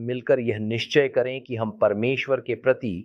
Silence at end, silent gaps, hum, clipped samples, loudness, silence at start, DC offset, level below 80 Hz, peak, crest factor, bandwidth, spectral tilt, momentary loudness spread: 0 s; none; none; under 0.1%; -24 LUFS; 0 s; under 0.1%; -62 dBFS; -6 dBFS; 18 dB; 7.4 kHz; -6.5 dB/octave; 6 LU